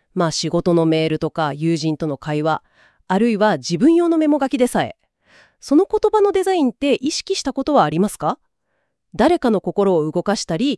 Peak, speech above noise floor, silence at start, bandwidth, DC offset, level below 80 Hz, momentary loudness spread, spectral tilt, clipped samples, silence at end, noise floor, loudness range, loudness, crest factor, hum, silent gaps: -2 dBFS; 54 dB; 0.15 s; 12 kHz; under 0.1%; -50 dBFS; 7 LU; -5.5 dB/octave; under 0.1%; 0 s; -72 dBFS; 2 LU; -18 LUFS; 16 dB; none; none